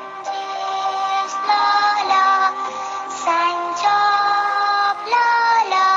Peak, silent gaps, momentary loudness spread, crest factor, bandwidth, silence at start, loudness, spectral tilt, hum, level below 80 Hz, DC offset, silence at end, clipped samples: -4 dBFS; none; 10 LU; 14 dB; 7.8 kHz; 0 s; -18 LUFS; -0.5 dB/octave; none; -84 dBFS; under 0.1%; 0 s; under 0.1%